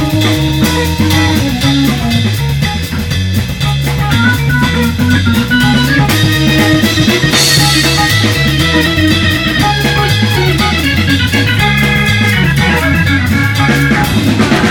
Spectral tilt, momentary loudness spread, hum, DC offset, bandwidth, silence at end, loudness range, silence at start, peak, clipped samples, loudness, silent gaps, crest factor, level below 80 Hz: -4.5 dB/octave; 5 LU; none; under 0.1%; 20 kHz; 0 s; 4 LU; 0 s; 0 dBFS; under 0.1%; -10 LUFS; none; 10 dB; -24 dBFS